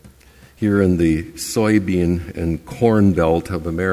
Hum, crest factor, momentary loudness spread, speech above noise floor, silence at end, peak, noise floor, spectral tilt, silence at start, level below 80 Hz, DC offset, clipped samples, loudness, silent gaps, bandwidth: none; 16 dB; 9 LU; 30 dB; 0 s; -2 dBFS; -47 dBFS; -7 dB/octave; 0.05 s; -34 dBFS; under 0.1%; under 0.1%; -18 LUFS; none; 16 kHz